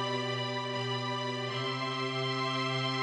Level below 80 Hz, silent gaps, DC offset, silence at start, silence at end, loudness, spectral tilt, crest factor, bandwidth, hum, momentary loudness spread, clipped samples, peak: -76 dBFS; none; under 0.1%; 0 s; 0 s; -33 LUFS; -4.5 dB/octave; 14 dB; 10.5 kHz; none; 3 LU; under 0.1%; -18 dBFS